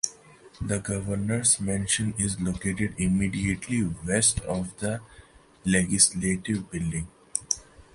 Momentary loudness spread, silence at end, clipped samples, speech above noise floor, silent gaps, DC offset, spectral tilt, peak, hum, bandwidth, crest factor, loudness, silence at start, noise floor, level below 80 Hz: 11 LU; 0.15 s; under 0.1%; 25 dB; none; under 0.1%; -3.5 dB/octave; -4 dBFS; none; 11.5 kHz; 22 dB; -26 LUFS; 0.05 s; -52 dBFS; -46 dBFS